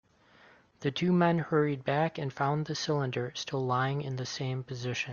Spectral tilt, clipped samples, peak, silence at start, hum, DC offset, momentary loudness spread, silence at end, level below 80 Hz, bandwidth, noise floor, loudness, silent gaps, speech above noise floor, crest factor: -6 dB/octave; under 0.1%; -12 dBFS; 0.8 s; none; under 0.1%; 9 LU; 0 s; -68 dBFS; 7.2 kHz; -60 dBFS; -31 LUFS; none; 30 dB; 20 dB